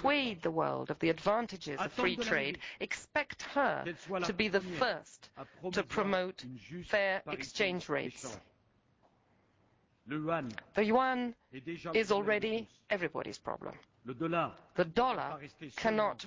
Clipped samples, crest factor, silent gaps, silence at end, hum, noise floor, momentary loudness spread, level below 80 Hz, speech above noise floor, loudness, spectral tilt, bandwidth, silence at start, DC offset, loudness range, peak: under 0.1%; 18 dB; none; 0 s; none; -71 dBFS; 14 LU; -66 dBFS; 37 dB; -34 LUFS; -5 dB/octave; 8 kHz; 0 s; under 0.1%; 3 LU; -18 dBFS